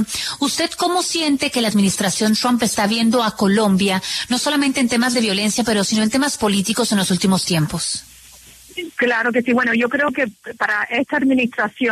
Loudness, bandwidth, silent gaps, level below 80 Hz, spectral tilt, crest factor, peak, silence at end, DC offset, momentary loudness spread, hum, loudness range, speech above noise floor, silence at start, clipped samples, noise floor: -18 LUFS; 13.5 kHz; none; -52 dBFS; -3.5 dB/octave; 14 dB; -4 dBFS; 0 s; under 0.1%; 4 LU; none; 2 LU; 26 dB; 0 s; under 0.1%; -44 dBFS